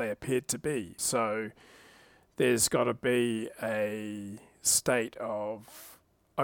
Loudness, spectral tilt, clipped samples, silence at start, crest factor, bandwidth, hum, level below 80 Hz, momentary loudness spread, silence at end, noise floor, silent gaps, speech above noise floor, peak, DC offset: -30 LUFS; -3 dB/octave; under 0.1%; 0 s; 20 dB; 19 kHz; none; -64 dBFS; 16 LU; 0 s; -59 dBFS; none; 28 dB; -12 dBFS; under 0.1%